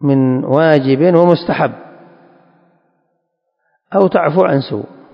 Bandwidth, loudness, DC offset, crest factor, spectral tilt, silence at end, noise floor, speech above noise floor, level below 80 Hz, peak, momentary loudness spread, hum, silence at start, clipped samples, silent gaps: 5.4 kHz; -13 LUFS; under 0.1%; 14 dB; -10 dB/octave; 0.3 s; -69 dBFS; 57 dB; -58 dBFS; 0 dBFS; 9 LU; none; 0 s; 0.2%; none